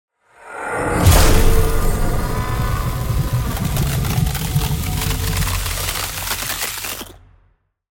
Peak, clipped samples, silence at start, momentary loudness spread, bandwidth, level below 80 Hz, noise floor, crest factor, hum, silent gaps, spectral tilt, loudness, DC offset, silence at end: 0 dBFS; under 0.1%; 0.4 s; 9 LU; 17 kHz; -22 dBFS; -59 dBFS; 18 dB; none; none; -4.5 dB/octave; -19 LUFS; under 0.1%; 0.85 s